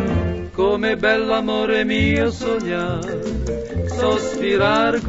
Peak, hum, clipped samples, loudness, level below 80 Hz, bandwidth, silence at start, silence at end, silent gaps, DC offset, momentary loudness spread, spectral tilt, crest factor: -2 dBFS; none; under 0.1%; -20 LUFS; -34 dBFS; 8 kHz; 0 s; 0 s; none; under 0.1%; 8 LU; -6 dB/octave; 16 dB